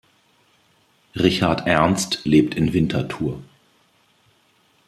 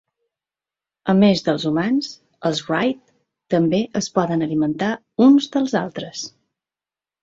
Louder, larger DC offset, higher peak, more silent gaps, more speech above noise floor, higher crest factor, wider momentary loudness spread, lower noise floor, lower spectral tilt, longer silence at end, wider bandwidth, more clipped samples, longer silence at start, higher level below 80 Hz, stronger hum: about the same, -20 LUFS vs -19 LUFS; neither; about the same, -2 dBFS vs -2 dBFS; neither; second, 41 dB vs over 72 dB; about the same, 22 dB vs 18 dB; second, 10 LU vs 14 LU; second, -60 dBFS vs under -90 dBFS; about the same, -5.5 dB/octave vs -6 dB/octave; first, 1.45 s vs 0.95 s; first, 14 kHz vs 7.8 kHz; neither; about the same, 1.15 s vs 1.05 s; first, -48 dBFS vs -60 dBFS; neither